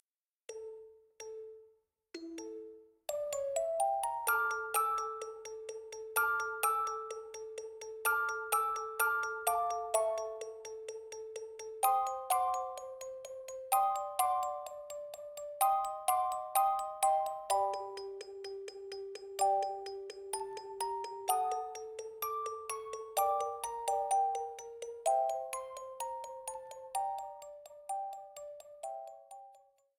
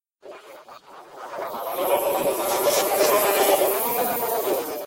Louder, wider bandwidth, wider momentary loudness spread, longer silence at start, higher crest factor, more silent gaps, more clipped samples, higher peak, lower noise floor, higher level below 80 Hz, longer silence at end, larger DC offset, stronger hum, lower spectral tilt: second, -36 LUFS vs -21 LUFS; first, 19.5 kHz vs 17 kHz; about the same, 16 LU vs 14 LU; first, 0.5 s vs 0.25 s; about the same, 20 dB vs 18 dB; neither; neither; second, -16 dBFS vs -6 dBFS; first, -69 dBFS vs -45 dBFS; second, -76 dBFS vs -64 dBFS; first, 0.4 s vs 0 s; neither; neither; second, -0.5 dB/octave vs -2 dB/octave